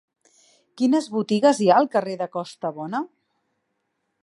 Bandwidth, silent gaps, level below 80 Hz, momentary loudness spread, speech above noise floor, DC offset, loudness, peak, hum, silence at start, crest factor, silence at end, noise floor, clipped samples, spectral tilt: 11.5 kHz; none; -76 dBFS; 13 LU; 54 dB; under 0.1%; -22 LUFS; -4 dBFS; none; 0.75 s; 20 dB; 1.2 s; -75 dBFS; under 0.1%; -5.5 dB/octave